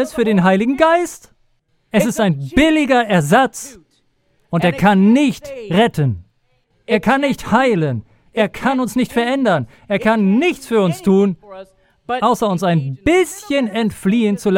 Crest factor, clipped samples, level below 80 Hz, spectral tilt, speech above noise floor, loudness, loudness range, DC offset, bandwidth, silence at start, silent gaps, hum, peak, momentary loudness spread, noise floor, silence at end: 16 dB; under 0.1%; -44 dBFS; -6 dB/octave; 46 dB; -16 LUFS; 2 LU; under 0.1%; 16.5 kHz; 0 s; none; none; 0 dBFS; 7 LU; -61 dBFS; 0 s